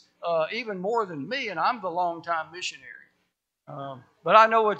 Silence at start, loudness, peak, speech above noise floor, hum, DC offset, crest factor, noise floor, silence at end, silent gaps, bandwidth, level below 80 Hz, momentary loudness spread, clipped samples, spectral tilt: 0.2 s; -25 LUFS; -2 dBFS; 51 dB; none; under 0.1%; 24 dB; -76 dBFS; 0 s; none; 8.6 kHz; -82 dBFS; 21 LU; under 0.1%; -4 dB/octave